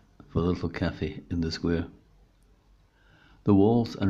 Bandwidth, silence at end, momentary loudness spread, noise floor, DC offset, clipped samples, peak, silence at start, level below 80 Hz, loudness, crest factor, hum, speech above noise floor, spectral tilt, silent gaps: 7.8 kHz; 0 s; 12 LU; -61 dBFS; under 0.1%; under 0.1%; -10 dBFS; 0.35 s; -50 dBFS; -27 LUFS; 18 dB; none; 35 dB; -8 dB/octave; none